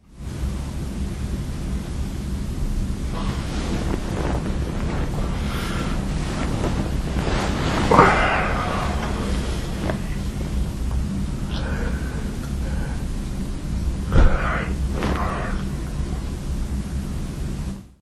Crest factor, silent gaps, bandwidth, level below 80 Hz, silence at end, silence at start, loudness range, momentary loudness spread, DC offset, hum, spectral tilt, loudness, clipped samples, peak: 22 dB; none; 13 kHz; -26 dBFS; 0.1 s; 0.1 s; 7 LU; 9 LU; under 0.1%; none; -6 dB/octave; -25 LUFS; under 0.1%; 0 dBFS